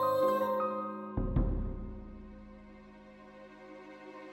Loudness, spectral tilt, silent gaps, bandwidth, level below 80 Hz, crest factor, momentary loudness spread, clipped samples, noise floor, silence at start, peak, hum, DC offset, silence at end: -34 LUFS; -8 dB/octave; none; 16.5 kHz; -42 dBFS; 18 dB; 24 LU; under 0.1%; -53 dBFS; 0 s; -18 dBFS; none; under 0.1%; 0 s